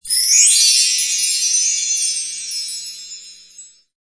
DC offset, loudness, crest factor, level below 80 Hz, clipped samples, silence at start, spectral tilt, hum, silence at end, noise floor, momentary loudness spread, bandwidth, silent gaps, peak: under 0.1%; -13 LUFS; 18 dB; -62 dBFS; under 0.1%; 0.05 s; 6.5 dB/octave; none; 0.35 s; -43 dBFS; 20 LU; 11 kHz; none; 0 dBFS